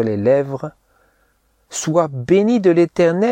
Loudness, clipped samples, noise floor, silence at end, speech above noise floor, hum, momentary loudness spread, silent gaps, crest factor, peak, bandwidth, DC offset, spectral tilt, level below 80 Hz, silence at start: -16 LUFS; under 0.1%; -61 dBFS; 0 s; 45 dB; none; 14 LU; none; 16 dB; -2 dBFS; 10 kHz; under 0.1%; -6 dB/octave; -56 dBFS; 0 s